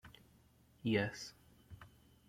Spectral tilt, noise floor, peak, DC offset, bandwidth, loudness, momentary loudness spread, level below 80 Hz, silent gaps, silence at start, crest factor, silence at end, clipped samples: -5.5 dB/octave; -68 dBFS; -20 dBFS; under 0.1%; 16.5 kHz; -39 LUFS; 24 LU; -70 dBFS; none; 0.05 s; 22 dB; 0.4 s; under 0.1%